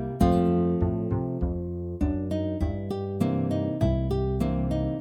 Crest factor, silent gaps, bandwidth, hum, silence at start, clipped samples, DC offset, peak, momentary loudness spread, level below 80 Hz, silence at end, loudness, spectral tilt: 18 dB; none; 14 kHz; none; 0 s; under 0.1%; under 0.1%; -8 dBFS; 7 LU; -34 dBFS; 0 s; -27 LUFS; -9 dB/octave